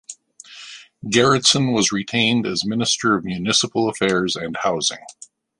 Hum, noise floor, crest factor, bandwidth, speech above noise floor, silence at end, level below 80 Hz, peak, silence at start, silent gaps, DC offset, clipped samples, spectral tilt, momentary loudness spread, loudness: none; -43 dBFS; 20 dB; 11.5 kHz; 24 dB; 0.5 s; -56 dBFS; 0 dBFS; 0.1 s; none; under 0.1%; under 0.1%; -3 dB/octave; 21 LU; -18 LUFS